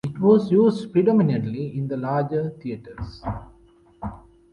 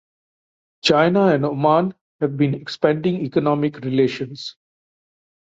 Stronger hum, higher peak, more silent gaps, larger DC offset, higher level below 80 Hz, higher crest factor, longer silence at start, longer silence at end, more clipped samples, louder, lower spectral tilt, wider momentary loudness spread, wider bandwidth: neither; about the same, -4 dBFS vs -2 dBFS; second, none vs 2.01-2.19 s; neither; first, -48 dBFS vs -60 dBFS; about the same, 18 dB vs 18 dB; second, 0.05 s vs 0.85 s; second, 0.35 s vs 0.9 s; neither; about the same, -21 LUFS vs -19 LUFS; first, -9.5 dB/octave vs -6.5 dB/octave; first, 18 LU vs 12 LU; first, 10 kHz vs 8 kHz